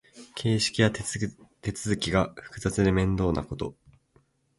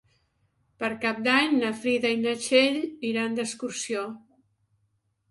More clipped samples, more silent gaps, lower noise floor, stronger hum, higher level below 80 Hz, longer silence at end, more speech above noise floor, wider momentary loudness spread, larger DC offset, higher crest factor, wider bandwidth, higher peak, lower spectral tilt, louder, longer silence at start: neither; neither; second, -65 dBFS vs -73 dBFS; neither; first, -44 dBFS vs -70 dBFS; second, 0.85 s vs 1.1 s; second, 39 dB vs 47 dB; about the same, 12 LU vs 11 LU; neither; about the same, 22 dB vs 20 dB; about the same, 11.5 kHz vs 11.5 kHz; about the same, -6 dBFS vs -8 dBFS; first, -5 dB/octave vs -3 dB/octave; second, -28 LUFS vs -25 LUFS; second, 0.15 s vs 0.8 s